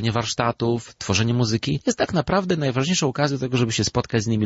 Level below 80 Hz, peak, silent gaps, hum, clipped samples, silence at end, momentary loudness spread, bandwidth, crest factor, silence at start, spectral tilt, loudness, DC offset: -46 dBFS; -6 dBFS; none; none; under 0.1%; 0 s; 3 LU; 8 kHz; 16 dB; 0 s; -5 dB/octave; -22 LUFS; under 0.1%